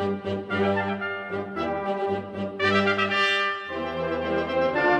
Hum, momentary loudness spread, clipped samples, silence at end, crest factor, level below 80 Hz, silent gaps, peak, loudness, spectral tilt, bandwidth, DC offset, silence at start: none; 9 LU; under 0.1%; 0 s; 18 dB; -56 dBFS; none; -8 dBFS; -25 LUFS; -5.5 dB/octave; 10 kHz; under 0.1%; 0 s